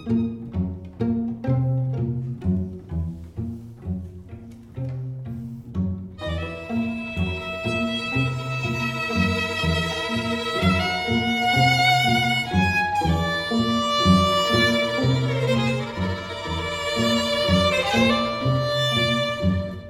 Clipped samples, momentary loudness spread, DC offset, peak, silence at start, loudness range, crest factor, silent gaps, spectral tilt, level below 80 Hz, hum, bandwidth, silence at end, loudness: under 0.1%; 14 LU; under 0.1%; -4 dBFS; 0 s; 11 LU; 18 dB; none; -5.5 dB/octave; -42 dBFS; none; 15.5 kHz; 0 s; -22 LUFS